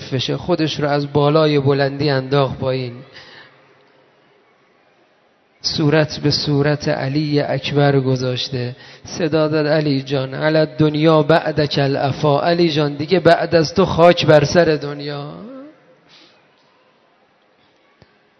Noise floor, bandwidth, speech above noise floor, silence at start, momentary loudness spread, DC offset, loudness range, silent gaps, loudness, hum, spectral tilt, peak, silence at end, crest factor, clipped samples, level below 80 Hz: -57 dBFS; 6.4 kHz; 41 dB; 0 s; 12 LU; under 0.1%; 10 LU; none; -16 LUFS; none; -6.5 dB/octave; 0 dBFS; 2.7 s; 18 dB; under 0.1%; -52 dBFS